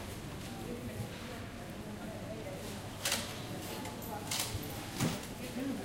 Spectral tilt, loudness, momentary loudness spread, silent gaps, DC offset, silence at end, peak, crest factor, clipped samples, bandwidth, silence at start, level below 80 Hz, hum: -3.5 dB/octave; -40 LUFS; 9 LU; none; under 0.1%; 0 s; -20 dBFS; 22 dB; under 0.1%; 16.5 kHz; 0 s; -56 dBFS; none